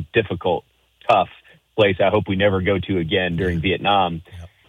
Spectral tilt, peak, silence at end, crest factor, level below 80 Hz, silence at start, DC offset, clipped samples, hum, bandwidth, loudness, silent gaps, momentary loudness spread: -7.5 dB/octave; -4 dBFS; 0.2 s; 16 dB; -48 dBFS; 0 s; under 0.1%; under 0.1%; none; 9.6 kHz; -20 LUFS; none; 9 LU